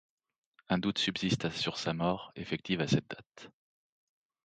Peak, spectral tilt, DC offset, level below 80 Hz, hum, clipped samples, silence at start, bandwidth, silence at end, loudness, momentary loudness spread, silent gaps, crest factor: -16 dBFS; -5 dB/octave; under 0.1%; -62 dBFS; none; under 0.1%; 0.7 s; 9.2 kHz; 0.95 s; -33 LUFS; 16 LU; none; 20 dB